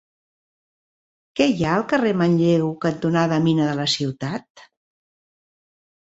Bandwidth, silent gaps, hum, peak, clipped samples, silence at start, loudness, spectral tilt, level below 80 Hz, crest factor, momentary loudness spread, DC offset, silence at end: 8 kHz; 4.50-4.55 s; none; -4 dBFS; under 0.1%; 1.35 s; -20 LUFS; -6 dB/octave; -58 dBFS; 18 dB; 10 LU; under 0.1%; 1.5 s